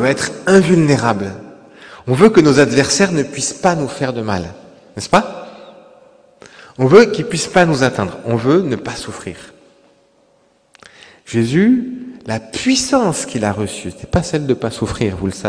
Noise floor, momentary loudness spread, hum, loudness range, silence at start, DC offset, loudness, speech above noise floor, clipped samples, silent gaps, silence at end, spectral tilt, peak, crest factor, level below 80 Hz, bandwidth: -56 dBFS; 18 LU; none; 7 LU; 0 s; under 0.1%; -15 LUFS; 41 dB; 0.4%; none; 0 s; -5 dB/octave; 0 dBFS; 16 dB; -44 dBFS; 11 kHz